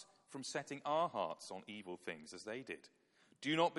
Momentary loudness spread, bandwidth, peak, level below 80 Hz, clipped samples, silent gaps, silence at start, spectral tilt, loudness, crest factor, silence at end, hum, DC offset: 12 LU; 11.5 kHz; -20 dBFS; -88 dBFS; under 0.1%; none; 0 s; -4 dB/octave; -43 LUFS; 22 dB; 0 s; none; under 0.1%